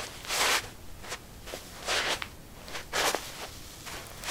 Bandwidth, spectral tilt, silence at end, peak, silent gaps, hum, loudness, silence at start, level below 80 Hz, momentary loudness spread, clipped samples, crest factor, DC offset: 17.5 kHz; -1 dB/octave; 0 s; -10 dBFS; none; none; -31 LUFS; 0 s; -52 dBFS; 16 LU; under 0.1%; 24 dB; under 0.1%